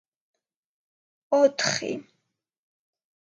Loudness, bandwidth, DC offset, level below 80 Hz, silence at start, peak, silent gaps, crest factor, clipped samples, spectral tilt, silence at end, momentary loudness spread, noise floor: -24 LUFS; 8.8 kHz; under 0.1%; -80 dBFS; 1.3 s; -8 dBFS; none; 22 dB; under 0.1%; -3 dB/octave; 1.3 s; 13 LU; -79 dBFS